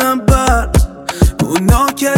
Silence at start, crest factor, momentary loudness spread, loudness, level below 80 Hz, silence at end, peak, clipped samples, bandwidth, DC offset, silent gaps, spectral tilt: 0 s; 10 dB; 4 LU; -13 LUFS; -16 dBFS; 0 s; 0 dBFS; under 0.1%; 17.5 kHz; under 0.1%; none; -5.5 dB/octave